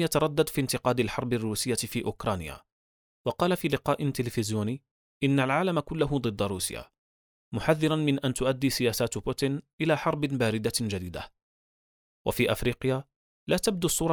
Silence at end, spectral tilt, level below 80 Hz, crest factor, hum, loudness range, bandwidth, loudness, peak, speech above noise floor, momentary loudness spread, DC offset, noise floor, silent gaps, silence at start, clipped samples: 0 s; -5 dB/octave; -52 dBFS; 20 dB; none; 3 LU; over 20 kHz; -28 LUFS; -8 dBFS; over 62 dB; 9 LU; under 0.1%; under -90 dBFS; 2.72-3.25 s, 4.91-5.21 s, 6.98-7.52 s, 9.73-9.78 s, 11.42-12.25 s, 13.16-13.47 s; 0 s; under 0.1%